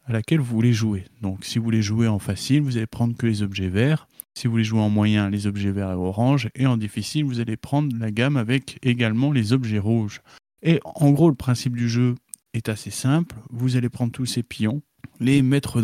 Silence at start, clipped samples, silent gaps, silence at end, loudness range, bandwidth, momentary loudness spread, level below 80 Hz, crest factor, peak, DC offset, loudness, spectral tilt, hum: 0.05 s; under 0.1%; none; 0 s; 2 LU; 15 kHz; 8 LU; -56 dBFS; 16 dB; -6 dBFS; under 0.1%; -22 LUFS; -6.5 dB/octave; none